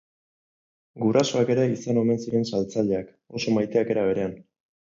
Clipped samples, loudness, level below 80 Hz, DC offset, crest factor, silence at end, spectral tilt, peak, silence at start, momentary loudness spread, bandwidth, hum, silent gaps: under 0.1%; -24 LUFS; -60 dBFS; under 0.1%; 18 dB; 0.45 s; -6 dB/octave; -6 dBFS; 0.95 s; 7 LU; 7.6 kHz; none; none